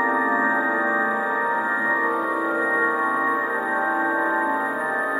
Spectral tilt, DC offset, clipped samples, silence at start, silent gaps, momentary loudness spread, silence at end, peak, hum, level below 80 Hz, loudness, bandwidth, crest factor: -5 dB/octave; under 0.1%; under 0.1%; 0 s; none; 3 LU; 0 s; -10 dBFS; none; -76 dBFS; -21 LUFS; 15.5 kHz; 12 dB